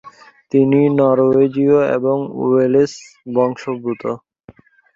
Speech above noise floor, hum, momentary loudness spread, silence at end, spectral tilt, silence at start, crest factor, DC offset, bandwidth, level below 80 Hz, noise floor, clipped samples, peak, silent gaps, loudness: 31 dB; none; 11 LU; 0.8 s; -8 dB/octave; 0.05 s; 14 dB; under 0.1%; 7.6 kHz; -60 dBFS; -46 dBFS; under 0.1%; -2 dBFS; none; -16 LUFS